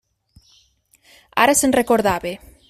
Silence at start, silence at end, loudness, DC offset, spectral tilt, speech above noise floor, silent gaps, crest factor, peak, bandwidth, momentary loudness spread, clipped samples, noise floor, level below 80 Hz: 1.35 s; 0.35 s; -17 LUFS; under 0.1%; -3 dB/octave; 41 dB; none; 20 dB; -2 dBFS; 16 kHz; 11 LU; under 0.1%; -58 dBFS; -50 dBFS